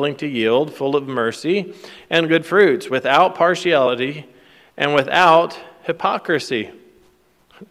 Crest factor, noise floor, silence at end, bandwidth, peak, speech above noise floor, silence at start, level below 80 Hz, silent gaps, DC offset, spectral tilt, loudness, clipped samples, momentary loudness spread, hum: 18 dB; -56 dBFS; 0.05 s; 15 kHz; 0 dBFS; 39 dB; 0 s; -64 dBFS; none; under 0.1%; -5 dB/octave; -17 LUFS; under 0.1%; 12 LU; none